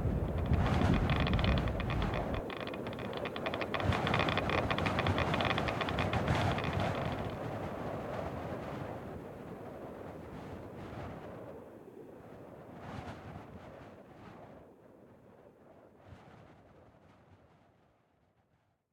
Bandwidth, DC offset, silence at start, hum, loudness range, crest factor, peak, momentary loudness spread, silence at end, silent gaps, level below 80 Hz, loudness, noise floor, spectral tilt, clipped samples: 17.5 kHz; under 0.1%; 0 s; none; 19 LU; 20 dB; -16 dBFS; 21 LU; 1.55 s; none; -46 dBFS; -35 LUFS; -75 dBFS; -6.5 dB/octave; under 0.1%